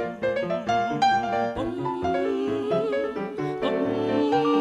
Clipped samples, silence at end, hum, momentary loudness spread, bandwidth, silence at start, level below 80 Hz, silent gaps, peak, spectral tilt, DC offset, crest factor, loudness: under 0.1%; 0 s; none; 6 LU; 10.5 kHz; 0 s; -54 dBFS; none; -10 dBFS; -6 dB/octave; under 0.1%; 14 dB; -25 LUFS